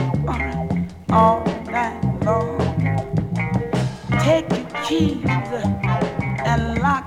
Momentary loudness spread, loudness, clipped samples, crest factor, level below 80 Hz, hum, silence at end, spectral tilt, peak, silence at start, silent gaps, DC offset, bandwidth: 6 LU; -21 LUFS; under 0.1%; 18 dB; -36 dBFS; none; 0 s; -7 dB/octave; -2 dBFS; 0 s; none; under 0.1%; 12 kHz